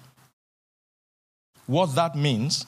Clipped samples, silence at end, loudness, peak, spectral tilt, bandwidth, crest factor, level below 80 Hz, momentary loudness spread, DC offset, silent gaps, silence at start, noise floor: under 0.1%; 0.05 s; -24 LUFS; -8 dBFS; -5 dB/octave; 14.5 kHz; 20 dB; -72 dBFS; 6 LU; under 0.1%; none; 1.7 s; under -90 dBFS